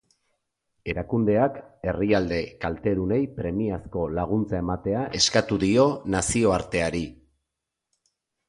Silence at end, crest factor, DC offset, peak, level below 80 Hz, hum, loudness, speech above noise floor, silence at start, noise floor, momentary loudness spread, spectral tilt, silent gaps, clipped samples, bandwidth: 1.35 s; 20 dB; under 0.1%; -6 dBFS; -44 dBFS; none; -25 LUFS; 60 dB; 0.85 s; -84 dBFS; 10 LU; -5 dB/octave; none; under 0.1%; 11.5 kHz